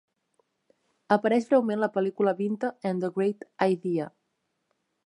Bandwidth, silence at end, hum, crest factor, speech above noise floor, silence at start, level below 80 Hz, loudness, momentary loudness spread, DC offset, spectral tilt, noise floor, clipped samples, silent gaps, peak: 10.5 kHz; 1 s; none; 20 dB; 52 dB; 1.1 s; -80 dBFS; -27 LUFS; 7 LU; under 0.1%; -7.5 dB/octave; -78 dBFS; under 0.1%; none; -8 dBFS